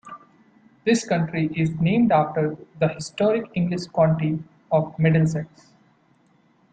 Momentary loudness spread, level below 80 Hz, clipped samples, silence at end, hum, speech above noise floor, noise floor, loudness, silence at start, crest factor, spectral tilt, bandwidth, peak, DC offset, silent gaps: 9 LU; -58 dBFS; under 0.1%; 1.25 s; none; 39 dB; -60 dBFS; -22 LUFS; 0.05 s; 18 dB; -7 dB/octave; 9.2 kHz; -4 dBFS; under 0.1%; none